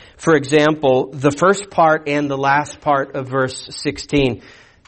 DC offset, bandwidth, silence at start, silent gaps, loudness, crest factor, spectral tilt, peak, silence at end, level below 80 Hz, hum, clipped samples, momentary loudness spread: under 0.1%; 8.8 kHz; 0.2 s; none; -17 LUFS; 14 dB; -5 dB/octave; -2 dBFS; 0.5 s; -44 dBFS; none; under 0.1%; 8 LU